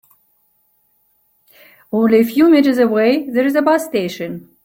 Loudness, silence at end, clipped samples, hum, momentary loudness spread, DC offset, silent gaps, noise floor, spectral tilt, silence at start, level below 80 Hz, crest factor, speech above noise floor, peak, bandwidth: -14 LUFS; 0.25 s; under 0.1%; none; 12 LU; under 0.1%; none; -61 dBFS; -6 dB/octave; 1.95 s; -60 dBFS; 14 dB; 47 dB; -2 dBFS; 17 kHz